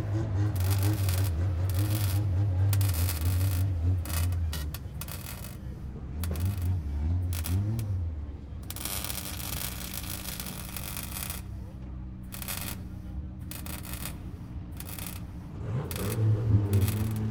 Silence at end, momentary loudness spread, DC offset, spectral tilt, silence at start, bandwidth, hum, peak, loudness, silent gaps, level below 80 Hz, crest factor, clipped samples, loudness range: 0 s; 13 LU; under 0.1%; -5.5 dB/octave; 0 s; 19 kHz; none; -10 dBFS; -31 LUFS; none; -42 dBFS; 20 dB; under 0.1%; 10 LU